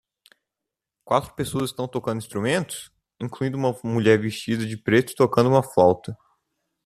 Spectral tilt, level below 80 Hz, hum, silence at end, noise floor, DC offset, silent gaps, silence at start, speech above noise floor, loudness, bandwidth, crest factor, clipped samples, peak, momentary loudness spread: -6 dB/octave; -58 dBFS; none; 0.7 s; -86 dBFS; under 0.1%; none; 1.05 s; 64 dB; -23 LUFS; 14 kHz; 20 dB; under 0.1%; -4 dBFS; 13 LU